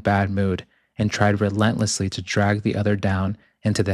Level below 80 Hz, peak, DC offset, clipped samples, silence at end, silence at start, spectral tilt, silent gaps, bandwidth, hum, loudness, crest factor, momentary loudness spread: -52 dBFS; -4 dBFS; under 0.1%; under 0.1%; 0 s; 0.05 s; -5.5 dB/octave; none; 12 kHz; none; -22 LUFS; 18 dB; 7 LU